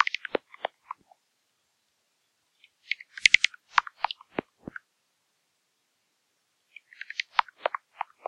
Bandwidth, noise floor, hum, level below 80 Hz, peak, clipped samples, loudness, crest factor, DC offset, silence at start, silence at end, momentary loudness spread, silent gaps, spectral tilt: 12 kHz; -75 dBFS; none; -70 dBFS; -2 dBFS; under 0.1%; -27 LUFS; 30 dB; under 0.1%; 0 s; 0.6 s; 24 LU; none; -0.5 dB/octave